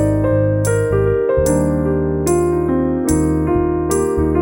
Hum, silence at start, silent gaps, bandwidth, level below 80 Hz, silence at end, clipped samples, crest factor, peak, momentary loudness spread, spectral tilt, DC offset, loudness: none; 0 s; none; 17 kHz; -28 dBFS; 0 s; under 0.1%; 12 dB; -4 dBFS; 2 LU; -7.5 dB/octave; under 0.1%; -16 LUFS